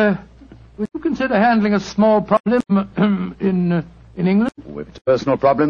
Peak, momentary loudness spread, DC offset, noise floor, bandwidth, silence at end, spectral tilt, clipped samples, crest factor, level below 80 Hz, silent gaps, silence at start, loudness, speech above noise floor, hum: -2 dBFS; 12 LU; under 0.1%; -43 dBFS; 7.2 kHz; 0 s; -7.5 dB/octave; under 0.1%; 16 dB; -48 dBFS; 2.40-2.44 s; 0 s; -18 LUFS; 26 dB; none